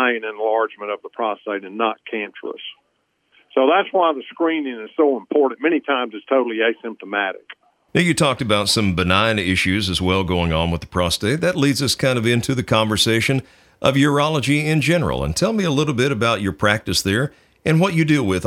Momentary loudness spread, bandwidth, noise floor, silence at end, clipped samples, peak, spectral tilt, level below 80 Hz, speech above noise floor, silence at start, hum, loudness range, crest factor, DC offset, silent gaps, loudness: 9 LU; 16.5 kHz; -68 dBFS; 0 s; under 0.1%; 0 dBFS; -5 dB/octave; -46 dBFS; 49 dB; 0 s; none; 4 LU; 18 dB; under 0.1%; none; -19 LUFS